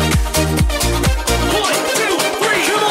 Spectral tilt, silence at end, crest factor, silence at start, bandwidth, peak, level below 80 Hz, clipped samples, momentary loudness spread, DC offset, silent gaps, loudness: -3.5 dB/octave; 0 s; 14 dB; 0 s; 16.5 kHz; -2 dBFS; -22 dBFS; under 0.1%; 2 LU; under 0.1%; none; -15 LUFS